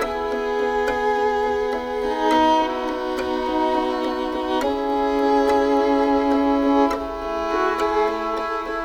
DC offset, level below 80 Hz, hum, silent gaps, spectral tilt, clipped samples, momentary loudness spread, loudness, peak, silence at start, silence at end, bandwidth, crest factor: under 0.1%; -44 dBFS; none; none; -4.5 dB/octave; under 0.1%; 7 LU; -21 LUFS; -6 dBFS; 0 s; 0 s; 15 kHz; 16 dB